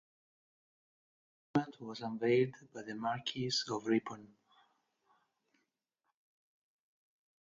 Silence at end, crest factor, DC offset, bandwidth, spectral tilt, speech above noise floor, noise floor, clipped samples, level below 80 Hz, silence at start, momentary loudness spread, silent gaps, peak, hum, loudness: 3.15 s; 22 dB; under 0.1%; 7.6 kHz; -5 dB/octave; 50 dB; -86 dBFS; under 0.1%; -78 dBFS; 1.55 s; 15 LU; none; -18 dBFS; none; -36 LUFS